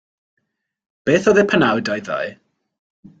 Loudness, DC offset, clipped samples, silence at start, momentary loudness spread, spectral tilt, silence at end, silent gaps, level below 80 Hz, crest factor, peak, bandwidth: -17 LUFS; under 0.1%; under 0.1%; 1.05 s; 12 LU; -5.5 dB/octave; 0.85 s; none; -56 dBFS; 18 dB; -2 dBFS; 8 kHz